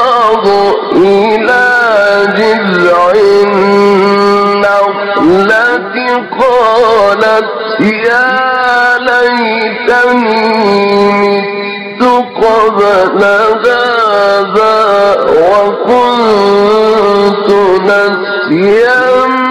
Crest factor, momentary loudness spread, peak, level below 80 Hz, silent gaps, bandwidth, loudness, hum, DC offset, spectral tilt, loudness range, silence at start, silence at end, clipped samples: 6 dB; 4 LU; 0 dBFS; -44 dBFS; none; 12 kHz; -8 LUFS; none; under 0.1%; -5.5 dB/octave; 2 LU; 0 s; 0 s; under 0.1%